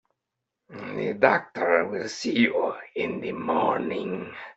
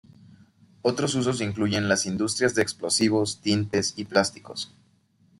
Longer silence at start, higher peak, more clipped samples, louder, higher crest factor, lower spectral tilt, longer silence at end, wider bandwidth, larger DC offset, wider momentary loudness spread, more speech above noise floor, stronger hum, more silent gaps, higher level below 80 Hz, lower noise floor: second, 0.7 s vs 0.85 s; about the same, -4 dBFS vs -4 dBFS; neither; about the same, -26 LUFS vs -25 LUFS; about the same, 24 dB vs 22 dB; about the same, -5 dB/octave vs -4 dB/octave; second, 0.05 s vs 0.75 s; second, 8.2 kHz vs 12.5 kHz; neither; first, 12 LU vs 6 LU; first, 59 dB vs 38 dB; neither; neither; second, -68 dBFS vs -62 dBFS; first, -84 dBFS vs -63 dBFS